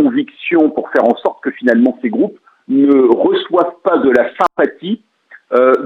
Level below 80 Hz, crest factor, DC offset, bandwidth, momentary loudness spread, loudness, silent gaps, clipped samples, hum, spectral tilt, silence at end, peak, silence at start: -60 dBFS; 14 dB; under 0.1%; 6.4 kHz; 8 LU; -14 LUFS; none; under 0.1%; none; -7 dB/octave; 0 s; 0 dBFS; 0 s